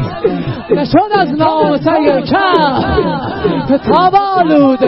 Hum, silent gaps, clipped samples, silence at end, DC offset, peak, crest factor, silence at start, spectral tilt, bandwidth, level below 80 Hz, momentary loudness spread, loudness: none; none; under 0.1%; 0 s; 0.4%; 0 dBFS; 10 dB; 0 s; -9 dB/octave; 5.8 kHz; -34 dBFS; 7 LU; -12 LUFS